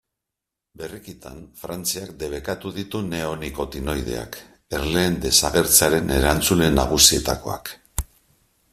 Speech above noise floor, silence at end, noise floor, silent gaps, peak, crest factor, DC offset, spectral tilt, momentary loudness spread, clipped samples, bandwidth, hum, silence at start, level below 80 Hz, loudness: 63 dB; 0.7 s; -85 dBFS; none; 0 dBFS; 22 dB; under 0.1%; -3 dB/octave; 22 LU; under 0.1%; 16 kHz; none; 0.8 s; -36 dBFS; -20 LUFS